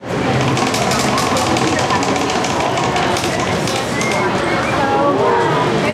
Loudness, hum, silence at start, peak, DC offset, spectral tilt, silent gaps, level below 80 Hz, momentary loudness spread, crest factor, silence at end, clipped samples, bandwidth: -16 LUFS; none; 0 s; -4 dBFS; under 0.1%; -4 dB/octave; none; -40 dBFS; 3 LU; 12 dB; 0 s; under 0.1%; 16 kHz